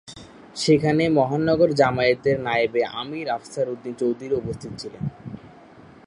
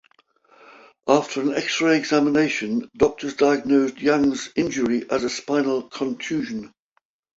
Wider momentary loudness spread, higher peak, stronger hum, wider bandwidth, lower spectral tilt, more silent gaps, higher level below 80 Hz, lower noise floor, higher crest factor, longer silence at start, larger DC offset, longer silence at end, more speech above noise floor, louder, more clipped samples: first, 18 LU vs 8 LU; about the same, -4 dBFS vs -2 dBFS; neither; first, 11.5 kHz vs 8 kHz; first, -6 dB/octave vs -4.5 dB/octave; neither; about the same, -54 dBFS vs -56 dBFS; second, -47 dBFS vs -60 dBFS; about the same, 20 dB vs 20 dB; second, 0.05 s vs 1.05 s; neither; second, 0.25 s vs 0.7 s; second, 25 dB vs 38 dB; about the same, -22 LUFS vs -22 LUFS; neither